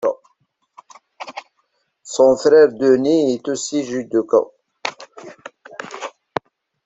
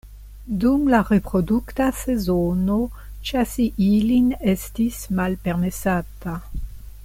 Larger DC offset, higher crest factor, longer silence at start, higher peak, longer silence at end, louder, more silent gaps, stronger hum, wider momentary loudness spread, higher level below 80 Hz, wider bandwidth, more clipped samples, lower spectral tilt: neither; about the same, 18 dB vs 16 dB; about the same, 0 s vs 0.05 s; first, -2 dBFS vs -6 dBFS; first, 0.75 s vs 0 s; first, -17 LUFS vs -21 LUFS; neither; neither; first, 24 LU vs 14 LU; second, -62 dBFS vs -36 dBFS; second, 8 kHz vs 16.5 kHz; neither; second, -4.5 dB/octave vs -6.5 dB/octave